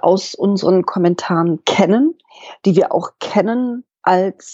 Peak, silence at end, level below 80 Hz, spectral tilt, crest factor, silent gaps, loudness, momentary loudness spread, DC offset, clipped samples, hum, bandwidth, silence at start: 0 dBFS; 0 s; -66 dBFS; -6 dB/octave; 16 dB; none; -16 LUFS; 7 LU; under 0.1%; under 0.1%; none; 8 kHz; 0.05 s